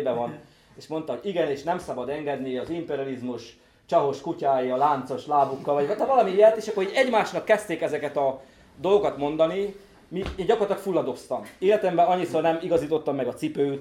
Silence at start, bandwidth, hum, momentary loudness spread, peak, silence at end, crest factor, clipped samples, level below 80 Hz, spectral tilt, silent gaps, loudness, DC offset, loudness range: 0 s; 14 kHz; none; 11 LU; -6 dBFS; 0 s; 18 dB; under 0.1%; -56 dBFS; -6 dB/octave; none; -25 LUFS; under 0.1%; 6 LU